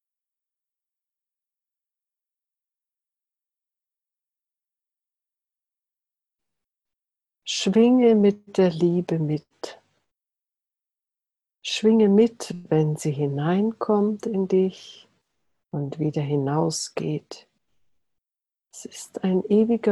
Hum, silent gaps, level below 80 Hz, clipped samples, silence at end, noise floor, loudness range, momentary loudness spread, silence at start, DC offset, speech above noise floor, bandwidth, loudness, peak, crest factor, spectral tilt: none; none; -68 dBFS; under 0.1%; 0 s; -89 dBFS; 7 LU; 18 LU; 7.45 s; under 0.1%; 68 dB; 12 kHz; -22 LUFS; -6 dBFS; 18 dB; -6.5 dB/octave